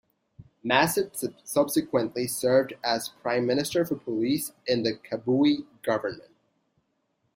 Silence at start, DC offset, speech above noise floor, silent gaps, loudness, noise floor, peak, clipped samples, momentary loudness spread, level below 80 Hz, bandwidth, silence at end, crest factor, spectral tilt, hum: 0.4 s; under 0.1%; 48 dB; none; -26 LUFS; -74 dBFS; -4 dBFS; under 0.1%; 7 LU; -66 dBFS; 16.5 kHz; 1.15 s; 22 dB; -4.5 dB/octave; none